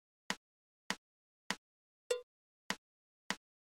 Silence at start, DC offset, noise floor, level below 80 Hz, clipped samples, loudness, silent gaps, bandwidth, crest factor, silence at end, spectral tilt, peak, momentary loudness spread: 0.3 s; under 0.1%; under -90 dBFS; -80 dBFS; under 0.1%; -44 LUFS; 0.37-0.90 s, 0.98-1.50 s, 1.58-2.10 s, 2.23-2.70 s, 2.78-3.30 s; 16 kHz; 28 dB; 0.4 s; -2 dB/octave; -18 dBFS; 3 LU